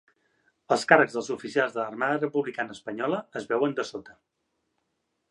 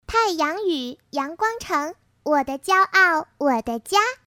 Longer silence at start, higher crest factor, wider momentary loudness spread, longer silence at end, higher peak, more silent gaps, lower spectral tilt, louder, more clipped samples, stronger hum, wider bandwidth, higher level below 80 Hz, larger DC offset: first, 0.7 s vs 0.1 s; first, 26 dB vs 18 dB; about the same, 13 LU vs 12 LU; first, 1.2 s vs 0.1 s; about the same, -2 dBFS vs -4 dBFS; neither; first, -4.5 dB/octave vs -2.5 dB/octave; second, -26 LUFS vs -21 LUFS; neither; neither; second, 11.5 kHz vs 18.5 kHz; second, -76 dBFS vs -52 dBFS; neither